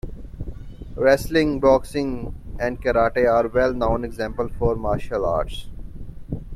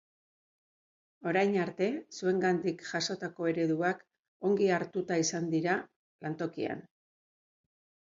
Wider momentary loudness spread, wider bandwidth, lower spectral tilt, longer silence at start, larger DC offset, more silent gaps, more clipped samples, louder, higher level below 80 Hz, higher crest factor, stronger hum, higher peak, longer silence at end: first, 19 LU vs 9 LU; first, 14.5 kHz vs 7.6 kHz; first, -6.5 dB/octave vs -5 dB/octave; second, 0.05 s vs 1.2 s; neither; second, none vs 4.19-4.40 s, 5.96-6.19 s; neither; first, -21 LUFS vs -32 LUFS; first, -34 dBFS vs -78 dBFS; about the same, 18 dB vs 18 dB; neither; first, -4 dBFS vs -14 dBFS; second, 0 s vs 1.4 s